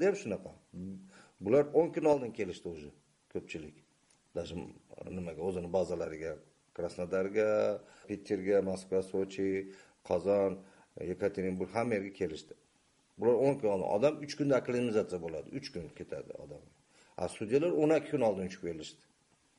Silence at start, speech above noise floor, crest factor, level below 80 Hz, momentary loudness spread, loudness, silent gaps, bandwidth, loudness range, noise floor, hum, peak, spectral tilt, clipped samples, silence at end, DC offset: 0 s; 38 dB; 20 dB; -66 dBFS; 18 LU; -34 LUFS; none; 11.5 kHz; 7 LU; -71 dBFS; none; -14 dBFS; -6.5 dB/octave; under 0.1%; 0.65 s; under 0.1%